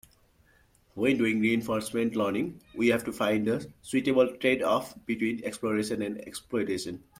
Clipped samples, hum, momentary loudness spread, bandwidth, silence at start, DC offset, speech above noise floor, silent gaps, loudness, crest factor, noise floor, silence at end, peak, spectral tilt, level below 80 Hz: under 0.1%; none; 9 LU; 16.5 kHz; 0.95 s; under 0.1%; 35 dB; none; -28 LUFS; 20 dB; -63 dBFS; 0.2 s; -10 dBFS; -5 dB/octave; -62 dBFS